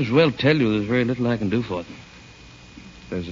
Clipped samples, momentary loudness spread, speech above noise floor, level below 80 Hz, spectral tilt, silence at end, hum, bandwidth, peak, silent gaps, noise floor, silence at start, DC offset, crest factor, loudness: under 0.1%; 24 LU; 24 dB; -50 dBFS; -7.5 dB/octave; 0 s; none; 7.6 kHz; -6 dBFS; none; -45 dBFS; 0 s; under 0.1%; 16 dB; -22 LUFS